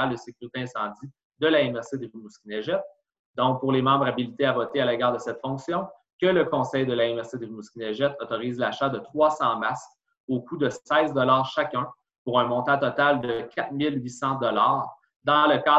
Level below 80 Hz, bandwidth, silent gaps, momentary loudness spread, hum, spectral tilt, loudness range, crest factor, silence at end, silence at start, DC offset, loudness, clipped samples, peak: -66 dBFS; 8.2 kHz; 1.25-1.30 s, 3.19-3.34 s, 6.13-6.19 s, 10.17-10.28 s, 12.18-12.26 s, 15.16-15.20 s; 14 LU; none; -6 dB/octave; 3 LU; 18 dB; 0 s; 0 s; under 0.1%; -25 LUFS; under 0.1%; -6 dBFS